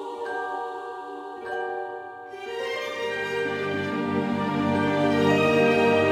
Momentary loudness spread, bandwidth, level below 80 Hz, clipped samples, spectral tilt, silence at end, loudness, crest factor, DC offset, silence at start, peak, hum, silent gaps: 16 LU; 15.5 kHz; -62 dBFS; under 0.1%; -6 dB/octave; 0 s; -25 LUFS; 16 dB; under 0.1%; 0 s; -8 dBFS; none; none